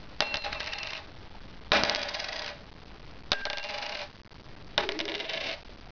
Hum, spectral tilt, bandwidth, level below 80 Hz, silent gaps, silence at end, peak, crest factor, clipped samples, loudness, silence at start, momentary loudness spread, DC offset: none; -2.5 dB/octave; 5.4 kHz; -52 dBFS; none; 0 s; -2 dBFS; 32 dB; under 0.1%; -31 LUFS; 0 s; 22 LU; under 0.1%